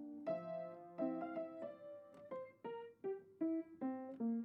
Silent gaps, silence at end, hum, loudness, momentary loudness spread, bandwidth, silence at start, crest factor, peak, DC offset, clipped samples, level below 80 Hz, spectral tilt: none; 0 s; none; -46 LUFS; 9 LU; 5.4 kHz; 0 s; 16 dB; -28 dBFS; under 0.1%; under 0.1%; under -90 dBFS; -7.5 dB/octave